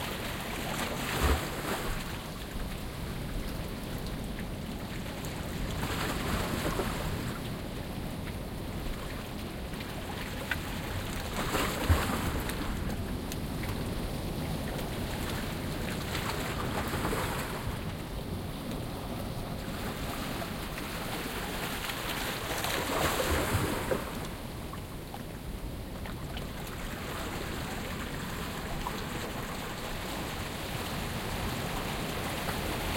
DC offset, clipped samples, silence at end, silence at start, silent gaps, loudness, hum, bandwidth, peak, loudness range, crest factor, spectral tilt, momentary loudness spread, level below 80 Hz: under 0.1%; under 0.1%; 0 s; 0 s; none; -35 LUFS; none; 17 kHz; -12 dBFS; 6 LU; 22 dB; -4.5 dB/octave; 8 LU; -42 dBFS